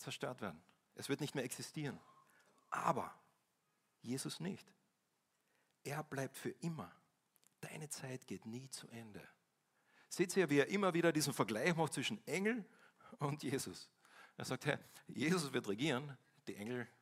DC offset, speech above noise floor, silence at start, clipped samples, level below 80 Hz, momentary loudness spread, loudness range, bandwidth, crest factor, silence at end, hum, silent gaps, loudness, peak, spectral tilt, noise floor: under 0.1%; 43 dB; 0 s; under 0.1%; -84 dBFS; 19 LU; 12 LU; 16 kHz; 24 dB; 0.15 s; none; none; -41 LUFS; -18 dBFS; -4.5 dB/octave; -84 dBFS